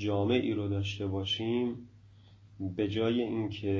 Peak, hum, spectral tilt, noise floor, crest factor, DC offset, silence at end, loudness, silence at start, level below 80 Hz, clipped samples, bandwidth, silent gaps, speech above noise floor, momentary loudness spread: -14 dBFS; none; -7 dB/octave; -56 dBFS; 18 dB; under 0.1%; 0 s; -32 LUFS; 0 s; -54 dBFS; under 0.1%; 7.6 kHz; none; 25 dB; 8 LU